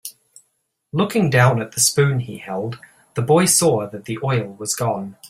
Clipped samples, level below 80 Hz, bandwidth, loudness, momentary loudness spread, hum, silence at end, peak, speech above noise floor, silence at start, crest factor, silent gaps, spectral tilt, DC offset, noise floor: under 0.1%; -56 dBFS; 16 kHz; -18 LUFS; 14 LU; none; 0 s; -2 dBFS; 51 dB; 0.05 s; 18 dB; none; -4.5 dB/octave; under 0.1%; -70 dBFS